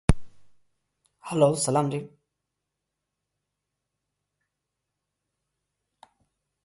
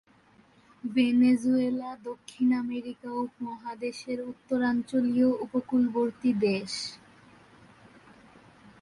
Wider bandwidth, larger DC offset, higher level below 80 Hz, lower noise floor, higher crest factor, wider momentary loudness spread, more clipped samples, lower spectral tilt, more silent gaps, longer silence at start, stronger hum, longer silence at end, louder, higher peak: about the same, 11.5 kHz vs 11.5 kHz; neither; first, -40 dBFS vs -68 dBFS; first, -84 dBFS vs -60 dBFS; first, 28 dB vs 14 dB; first, 20 LU vs 14 LU; neither; about the same, -5.5 dB/octave vs -5.5 dB/octave; neither; second, 0.1 s vs 0.85 s; first, 50 Hz at -65 dBFS vs none; first, 4.55 s vs 1.85 s; first, -25 LUFS vs -28 LUFS; first, -4 dBFS vs -14 dBFS